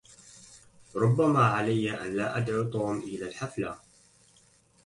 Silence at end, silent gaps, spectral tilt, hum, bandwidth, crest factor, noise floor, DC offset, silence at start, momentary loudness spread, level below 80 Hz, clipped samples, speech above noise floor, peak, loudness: 1.1 s; none; -7 dB/octave; none; 11.5 kHz; 18 dB; -62 dBFS; under 0.1%; 0.35 s; 16 LU; -62 dBFS; under 0.1%; 35 dB; -12 dBFS; -28 LUFS